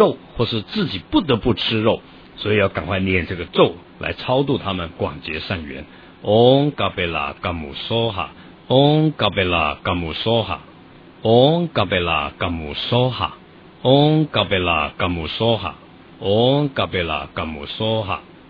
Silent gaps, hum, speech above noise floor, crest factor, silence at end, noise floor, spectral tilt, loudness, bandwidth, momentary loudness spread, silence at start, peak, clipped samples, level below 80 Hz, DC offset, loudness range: none; none; 25 dB; 20 dB; 0.25 s; -44 dBFS; -8.5 dB/octave; -19 LUFS; 5.2 kHz; 12 LU; 0 s; 0 dBFS; under 0.1%; -42 dBFS; under 0.1%; 3 LU